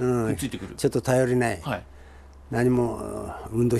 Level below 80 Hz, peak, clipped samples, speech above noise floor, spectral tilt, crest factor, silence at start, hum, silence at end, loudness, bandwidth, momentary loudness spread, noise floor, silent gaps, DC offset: -46 dBFS; -10 dBFS; under 0.1%; 22 dB; -6.5 dB/octave; 16 dB; 0 s; none; 0 s; -26 LUFS; 13 kHz; 11 LU; -46 dBFS; none; under 0.1%